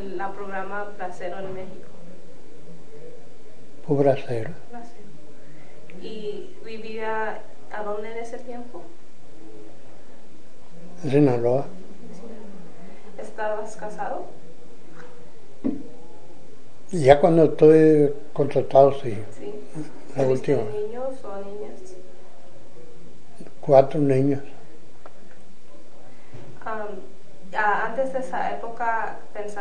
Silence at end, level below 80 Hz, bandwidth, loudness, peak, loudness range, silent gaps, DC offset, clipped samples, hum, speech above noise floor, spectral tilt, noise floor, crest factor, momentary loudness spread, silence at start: 0 s; -56 dBFS; 10 kHz; -23 LUFS; 0 dBFS; 17 LU; none; 6%; under 0.1%; none; 29 dB; -7.5 dB/octave; -52 dBFS; 24 dB; 26 LU; 0 s